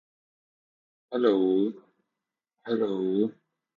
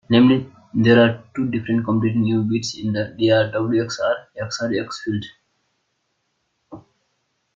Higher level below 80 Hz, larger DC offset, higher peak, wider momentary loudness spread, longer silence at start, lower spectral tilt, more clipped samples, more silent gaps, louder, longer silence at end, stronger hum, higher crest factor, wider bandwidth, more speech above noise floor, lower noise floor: second, -78 dBFS vs -58 dBFS; neither; second, -10 dBFS vs -2 dBFS; second, 9 LU vs 12 LU; first, 1.1 s vs 0.1 s; first, -8.5 dB/octave vs -6 dB/octave; neither; neither; second, -27 LUFS vs -20 LUFS; second, 0.45 s vs 0.75 s; neither; about the same, 20 dB vs 18 dB; second, 4.9 kHz vs 7.6 kHz; first, 62 dB vs 53 dB; first, -87 dBFS vs -71 dBFS